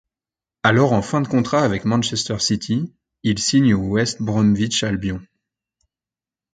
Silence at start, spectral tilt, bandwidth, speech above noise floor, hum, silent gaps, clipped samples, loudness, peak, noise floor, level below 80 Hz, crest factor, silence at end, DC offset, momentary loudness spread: 0.65 s; -5 dB/octave; 9.4 kHz; over 72 dB; none; none; under 0.1%; -19 LUFS; 0 dBFS; under -90 dBFS; -46 dBFS; 20 dB; 1.3 s; under 0.1%; 8 LU